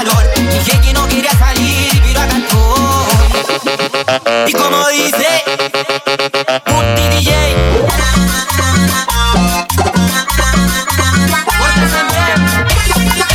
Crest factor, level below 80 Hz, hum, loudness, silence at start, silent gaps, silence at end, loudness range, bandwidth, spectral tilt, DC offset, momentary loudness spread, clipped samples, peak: 10 dB; -16 dBFS; none; -11 LUFS; 0 s; none; 0 s; 1 LU; 17.5 kHz; -4 dB/octave; under 0.1%; 3 LU; under 0.1%; 0 dBFS